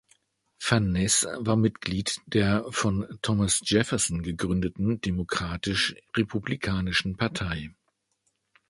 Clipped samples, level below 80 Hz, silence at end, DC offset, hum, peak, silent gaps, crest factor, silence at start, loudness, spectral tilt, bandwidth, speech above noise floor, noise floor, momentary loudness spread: under 0.1%; -46 dBFS; 1 s; under 0.1%; none; -6 dBFS; none; 22 dB; 0.6 s; -26 LUFS; -4 dB/octave; 11.5 kHz; 48 dB; -75 dBFS; 7 LU